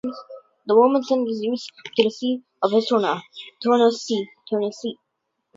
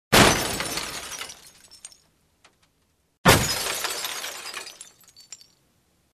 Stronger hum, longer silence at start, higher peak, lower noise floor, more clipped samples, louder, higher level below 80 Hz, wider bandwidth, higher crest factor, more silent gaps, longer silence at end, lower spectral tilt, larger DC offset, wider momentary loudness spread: neither; about the same, 0.05 s vs 0.1 s; about the same, -2 dBFS vs 0 dBFS; first, -77 dBFS vs -68 dBFS; neither; about the same, -22 LUFS vs -23 LUFS; second, -74 dBFS vs -44 dBFS; second, 7.8 kHz vs 14 kHz; second, 20 dB vs 26 dB; second, none vs 3.18-3.24 s; second, 0.65 s vs 0.8 s; first, -5 dB/octave vs -3 dB/octave; neither; second, 15 LU vs 27 LU